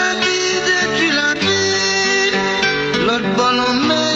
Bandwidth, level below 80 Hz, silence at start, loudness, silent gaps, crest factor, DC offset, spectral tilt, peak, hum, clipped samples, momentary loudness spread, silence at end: 8.2 kHz; -48 dBFS; 0 s; -15 LUFS; none; 12 dB; under 0.1%; -2.5 dB/octave; -4 dBFS; none; under 0.1%; 2 LU; 0 s